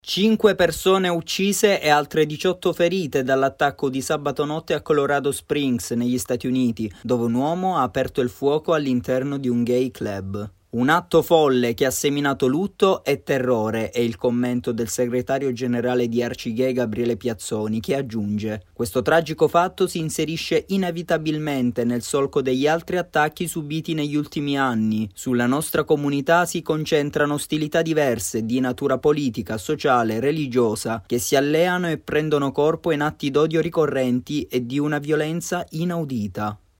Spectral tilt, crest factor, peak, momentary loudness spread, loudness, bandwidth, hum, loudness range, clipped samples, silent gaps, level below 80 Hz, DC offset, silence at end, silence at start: -5 dB/octave; 18 dB; -4 dBFS; 7 LU; -22 LUFS; 16.5 kHz; none; 3 LU; under 0.1%; none; -52 dBFS; under 0.1%; 0.2 s; 0.05 s